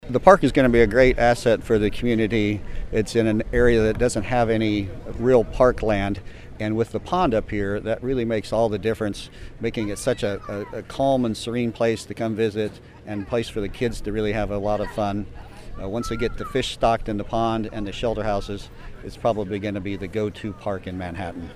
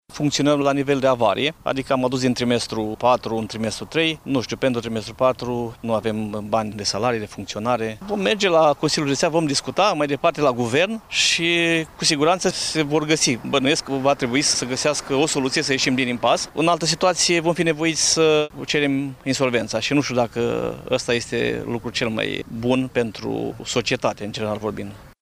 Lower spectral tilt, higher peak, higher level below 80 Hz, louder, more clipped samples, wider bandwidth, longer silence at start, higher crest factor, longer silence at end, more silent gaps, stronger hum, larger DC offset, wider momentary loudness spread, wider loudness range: first, -6 dB/octave vs -3.5 dB/octave; first, 0 dBFS vs -6 dBFS; first, -36 dBFS vs -50 dBFS; about the same, -23 LUFS vs -21 LUFS; neither; second, 13.5 kHz vs 15.5 kHz; about the same, 0.05 s vs 0.1 s; first, 22 dB vs 16 dB; about the same, 0 s vs 0.1 s; neither; neither; neither; first, 14 LU vs 8 LU; about the same, 6 LU vs 5 LU